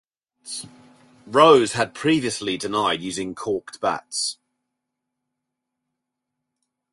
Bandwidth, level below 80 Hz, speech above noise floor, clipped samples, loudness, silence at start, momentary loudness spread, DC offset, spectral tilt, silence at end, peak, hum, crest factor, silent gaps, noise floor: 11.5 kHz; -62 dBFS; 61 dB; under 0.1%; -21 LUFS; 0.45 s; 19 LU; under 0.1%; -3.5 dB/octave; 2.6 s; -2 dBFS; none; 22 dB; none; -82 dBFS